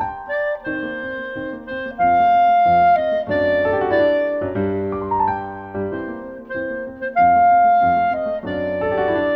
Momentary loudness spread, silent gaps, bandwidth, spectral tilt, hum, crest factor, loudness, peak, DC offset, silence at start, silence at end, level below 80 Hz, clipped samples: 14 LU; none; 5.2 kHz; -8.5 dB/octave; none; 12 dB; -18 LUFS; -6 dBFS; under 0.1%; 0 s; 0 s; -48 dBFS; under 0.1%